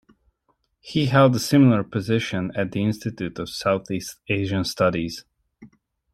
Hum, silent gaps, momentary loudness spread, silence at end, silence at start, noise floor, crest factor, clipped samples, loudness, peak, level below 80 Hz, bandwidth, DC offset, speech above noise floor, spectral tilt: none; none; 13 LU; 0.45 s; 0.85 s; -70 dBFS; 20 dB; under 0.1%; -22 LUFS; -4 dBFS; -56 dBFS; 14 kHz; under 0.1%; 48 dB; -6 dB/octave